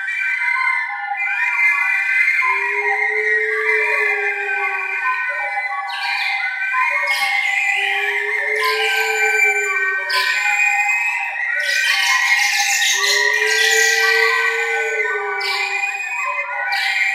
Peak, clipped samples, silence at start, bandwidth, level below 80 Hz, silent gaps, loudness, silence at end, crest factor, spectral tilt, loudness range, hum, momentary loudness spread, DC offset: -2 dBFS; under 0.1%; 0 s; 16 kHz; -86 dBFS; none; -16 LUFS; 0 s; 16 dB; 3.5 dB/octave; 4 LU; none; 7 LU; under 0.1%